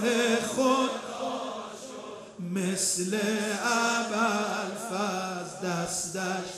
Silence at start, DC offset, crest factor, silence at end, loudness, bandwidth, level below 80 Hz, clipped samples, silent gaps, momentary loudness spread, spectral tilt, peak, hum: 0 s; under 0.1%; 16 dB; 0 s; -28 LUFS; 14.5 kHz; -70 dBFS; under 0.1%; none; 13 LU; -3.5 dB/octave; -12 dBFS; none